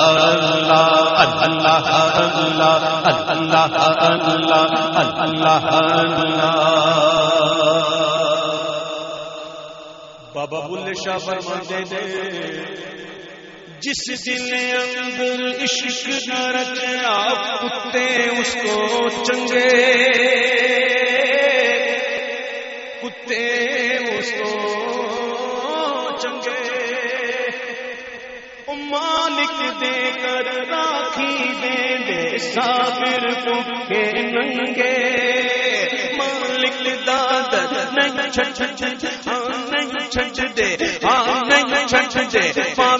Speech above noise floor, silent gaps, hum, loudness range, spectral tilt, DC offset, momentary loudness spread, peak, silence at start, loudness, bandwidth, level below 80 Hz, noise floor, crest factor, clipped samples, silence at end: 20 dB; none; none; 9 LU; -1 dB/octave; under 0.1%; 12 LU; 0 dBFS; 0 s; -18 LUFS; 8 kHz; -56 dBFS; -39 dBFS; 18 dB; under 0.1%; 0 s